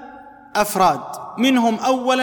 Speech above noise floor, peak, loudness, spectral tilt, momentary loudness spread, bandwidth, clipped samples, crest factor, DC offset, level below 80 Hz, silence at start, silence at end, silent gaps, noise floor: 23 dB; -4 dBFS; -18 LUFS; -4 dB/octave; 9 LU; 19 kHz; under 0.1%; 16 dB; under 0.1%; -56 dBFS; 0 s; 0 s; none; -41 dBFS